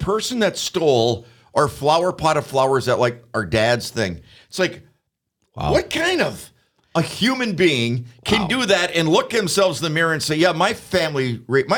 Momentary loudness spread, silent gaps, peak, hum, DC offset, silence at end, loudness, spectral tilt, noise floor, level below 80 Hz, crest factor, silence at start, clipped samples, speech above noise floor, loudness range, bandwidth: 7 LU; none; -2 dBFS; none; under 0.1%; 0 s; -19 LUFS; -4.5 dB/octave; -72 dBFS; -46 dBFS; 18 dB; 0 s; under 0.1%; 53 dB; 4 LU; 19.5 kHz